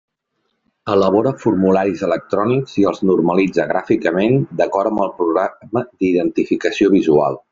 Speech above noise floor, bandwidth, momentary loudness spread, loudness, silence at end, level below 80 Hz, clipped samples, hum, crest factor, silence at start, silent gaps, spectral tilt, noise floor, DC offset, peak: 55 dB; 7.6 kHz; 5 LU; -17 LUFS; 0.15 s; -54 dBFS; under 0.1%; none; 16 dB; 0.85 s; none; -7.5 dB/octave; -71 dBFS; under 0.1%; -2 dBFS